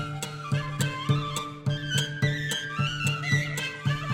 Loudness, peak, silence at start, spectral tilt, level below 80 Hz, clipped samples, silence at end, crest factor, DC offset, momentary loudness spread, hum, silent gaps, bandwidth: -28 LUFS; -12 dBFS; 0 s; -4.5 dB/octave; -52 dBFS; under 0.1%; 0 s; 18 dB; under 0.1%; 5 LU; none; none; 16.5 kHz